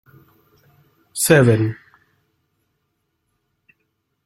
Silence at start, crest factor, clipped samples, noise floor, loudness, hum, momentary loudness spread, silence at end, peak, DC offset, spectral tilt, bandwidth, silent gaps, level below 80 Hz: 1.15 s; 20 dB; under 0.1%; -72 dBFS; -16 LUFS; none; 20 LU; 2.5 s; -2 dBFS; under 0.1%; -5 dB/octave; 15.5 kHz; none; -56 dBFS